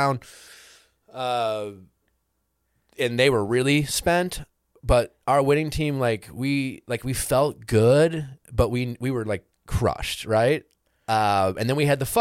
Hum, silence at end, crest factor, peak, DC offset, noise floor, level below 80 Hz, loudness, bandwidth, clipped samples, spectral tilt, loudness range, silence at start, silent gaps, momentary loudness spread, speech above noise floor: none; 0 s; 18 dB; -6 dBFS; under 0.1%; -74 dBFS; -40 dBFS; -23 LUFS; 16.5 kHz; under 0.1%; -5 dB/octave; 3 LU; 0 s; none; 11 LU; 51 dB